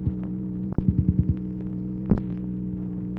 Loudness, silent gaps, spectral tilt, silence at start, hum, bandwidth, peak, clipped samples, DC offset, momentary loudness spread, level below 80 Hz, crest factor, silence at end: -27 LUFS; none; -13 dB/octave; 0 s; none; 2.8 kHz; -6 dBFS; under 0.1%; under 0.1%; 8 LU; -36 dBFS; 20 dB; 0 s